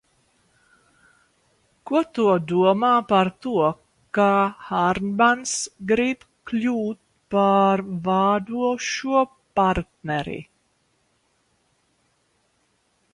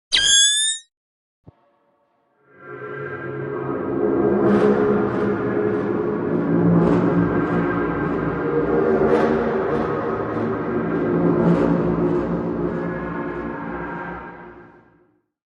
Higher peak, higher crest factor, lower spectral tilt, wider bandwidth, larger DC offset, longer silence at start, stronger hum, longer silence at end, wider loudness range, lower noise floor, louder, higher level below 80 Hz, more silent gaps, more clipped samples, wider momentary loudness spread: about the same, -6 dBFS vs -4 dBFS; about the same, 18 dB vs 18 dB; about the same, -5 dB/octave vs -4 dB/octave; about the same, 11.5 kHz vs 11 kHz; neither; first, 1.85 s vs 0.1 s; neither; first, 2.7 s vs 0.9 s; about the same, 6 LU vs 8 LU; about the same, -67 dBFS vs -64 dBFS; about the same, -22 LUFS vs -20 LUFS; second, -54 dBFS vs -46 dBFS; second, none vs 0.97-1.44 s; neither; second, 9 LU vs 13 LU